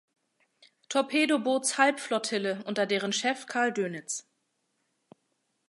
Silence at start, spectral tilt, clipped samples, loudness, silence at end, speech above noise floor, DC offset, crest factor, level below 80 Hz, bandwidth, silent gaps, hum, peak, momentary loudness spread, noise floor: 0.9 s; -2.5 dB/octave; under 0.1%; -28 LUFS; 1.5 s; 49 dB; under 0.1%; 24 dB; -86 dBFS; 11.5 kHz; none; none; -8 dBFS; 8 LU; -77 dBFS